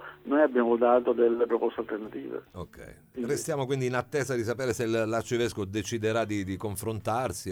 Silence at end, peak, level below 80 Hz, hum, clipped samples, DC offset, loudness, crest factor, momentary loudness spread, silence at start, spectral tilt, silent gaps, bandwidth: 0 s; -10 dBFS; -60 dBFS; none; under 0.1%; under 0.1%; -28 LUFS; 18 dB; 14 LU; 0 s; -5.5 dB/octave; none; 17.5 kHz